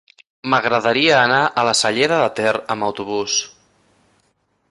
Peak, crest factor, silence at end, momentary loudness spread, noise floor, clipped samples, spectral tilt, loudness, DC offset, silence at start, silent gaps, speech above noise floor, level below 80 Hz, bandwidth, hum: -2 dBFS; 16 dB; 1.2 s; 9 LU; -65 dBFS; under 0.1%; -2.5 dB/octave; -17 LUFS; under 0.1%; 0.45 s; none; 48 dB; -60 dBFS; 11.5 kHz; none